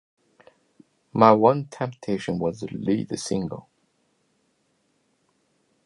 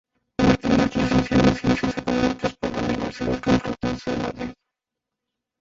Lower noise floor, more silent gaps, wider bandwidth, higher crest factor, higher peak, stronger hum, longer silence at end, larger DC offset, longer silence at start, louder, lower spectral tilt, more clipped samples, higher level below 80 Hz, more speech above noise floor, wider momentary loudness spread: second, -69 dBFS vs -85 dBFS; neither; first, 11.5 kHz vs 7.8 kHz; about the same, 24 dB vs 20 dB; about the same, -2 dBFS vs -4 dBFS; neither; first, 2.25 s vs 1.1 s; neither; first, 1.15 s vs 0.4 s; about the same, -23 LUFS vs -22 LUFS; about the same, -6.5 dB/octave vs -6.5 dB/octave; neither; second, -60 dBFS vs -40 dBFS; second, 47 dB vs 63 dB; first, 15 LU vs 9 LU